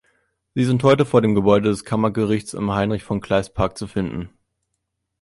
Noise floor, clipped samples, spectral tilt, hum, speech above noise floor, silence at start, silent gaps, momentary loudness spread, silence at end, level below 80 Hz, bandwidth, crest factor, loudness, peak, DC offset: -77 dBFS; under 0.1%; -7 dB/octave; none; 58 dB; 0.55 s; none; 10 LU; 0.95 s; -44 dBFS; 11.5 kHz; 18 dB; -20 LUFS; -2 dBFS; under 0.1%